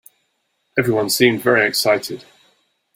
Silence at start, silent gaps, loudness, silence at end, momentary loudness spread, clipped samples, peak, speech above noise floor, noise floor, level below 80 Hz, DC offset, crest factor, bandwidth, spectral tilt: 0.75 s; none; -17 LUFS; 0.75 s; 11 LU; under 0.1%; 0 dBFS; 52 dB; -69 dBFS; -60 dBFS; under 0.1%; 18 dB; 16.5 kHz; -3.5 dB/octave